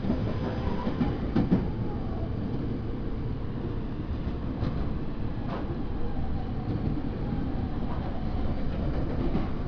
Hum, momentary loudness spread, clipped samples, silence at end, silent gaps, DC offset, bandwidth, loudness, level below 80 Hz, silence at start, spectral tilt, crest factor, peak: none; 6 LU; under 0.1%; 0 s; none; under 0.1%; 5.4 kHz; -32 LUFS; -34 dBFS; 0 s; -10 dB/octave; 16 dB; -12 dBFS